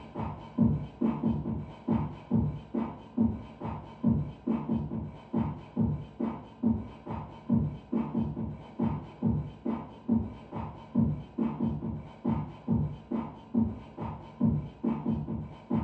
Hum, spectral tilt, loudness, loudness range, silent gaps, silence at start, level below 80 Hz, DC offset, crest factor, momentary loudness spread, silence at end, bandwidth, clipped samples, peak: none; -11 dB/octave; -33 LUFS; 1 LU; none; 0 s; -48 dBFS; under 0.1%; 18 dB; 9 LU; 0 s; 4.2 kHz; under 0.1%; -14 dBFS